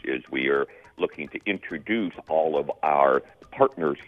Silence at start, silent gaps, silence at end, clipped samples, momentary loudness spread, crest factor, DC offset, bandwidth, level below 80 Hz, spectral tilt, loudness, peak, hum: 0.05 s; none; 0.05 s; under 0.1%; 10 LU; 20 dB; under 0.1%; 6 kHz; -62 dBFS; -7.5 dB/octave; -25 LUFS; -4 dBFS; none